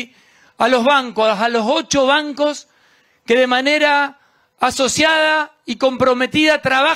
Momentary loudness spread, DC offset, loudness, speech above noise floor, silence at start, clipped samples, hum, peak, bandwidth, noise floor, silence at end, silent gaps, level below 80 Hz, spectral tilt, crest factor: 7 LU; under 0.1%; -15 LUFS; 40 dB; 0 s; under 0.1%; none; -2 dBFS; 15.5 kHz; -55 dBFS; 0 s; none; -54 dBFS; -2.5 dB/octave; 16 dB